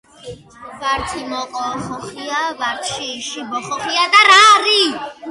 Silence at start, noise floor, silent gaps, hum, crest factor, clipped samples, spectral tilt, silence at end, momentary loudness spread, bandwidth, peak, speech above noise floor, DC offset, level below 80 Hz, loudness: 0.25 s; -36 dBFS; none; none; 16 dB; under 0.1%; -1 dB/octave; 0 s; 18 LU; 11.5 kHz; 0 dBFS; 20 dB; under 0.1%; -48 dBFS; -14 LUFS